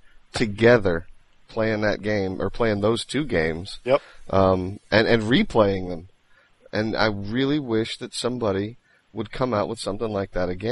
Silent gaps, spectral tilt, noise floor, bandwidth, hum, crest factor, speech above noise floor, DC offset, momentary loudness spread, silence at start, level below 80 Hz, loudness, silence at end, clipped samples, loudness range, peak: none; -6 dB/octave; -57 dBFS; 11.5 kHz; none; 20 dB; 35 dB; under 0.1%; 11 LU; 0.05 s; -42 dBFS; -23 LUFS; 0 s; under 0.1%; 4 LU; -4 dBFS